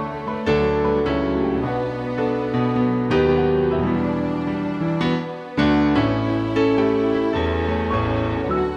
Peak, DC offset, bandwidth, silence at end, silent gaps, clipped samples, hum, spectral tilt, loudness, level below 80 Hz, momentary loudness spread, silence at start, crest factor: -6 dBFS; under 0.1%; 7.8 kHz; 0 s; none; under 0.1%; none; -8 dB/octave; -21 LUFS; -36 dBFS; 6 LU; 0 s; 14 dB